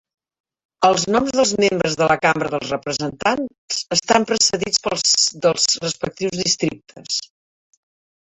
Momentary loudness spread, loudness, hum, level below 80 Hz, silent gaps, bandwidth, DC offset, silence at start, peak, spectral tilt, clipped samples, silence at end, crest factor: 9 LU; -18 LUFS; none; -56 dBFS; 3.58-3.68 s; 8.4 kHz; under 0.1%; 0.8 s; -2 dBFS; -2.5 dB/octave; under 0.1%; 1.05 s; 18 dB